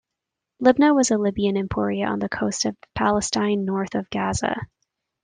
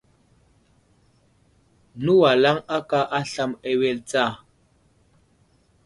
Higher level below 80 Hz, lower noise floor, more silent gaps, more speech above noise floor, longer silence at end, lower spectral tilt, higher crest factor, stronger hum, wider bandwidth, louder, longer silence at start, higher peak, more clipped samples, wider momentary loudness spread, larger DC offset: first, -50 dBFS vs -62 dBFS; first, -84 dBFS vs -61 dBFS; neither; first, 62 dB vs 40 dB; second, 0.6 s vs 1.5 s; about the same, -4.5 dB/octave vs -5.5 dB/octave; about the same, 18 dB vs 18 dB; neither; second, 10 kHz vs 11.5 kHz; about the same, -22 LUFS vs -21 LUFS; second, 0.6 s vs 1.95 s; about the same, -4 dBFS vs -6 dBFS; neither; about the same, 9 LU vs 11 LU; neither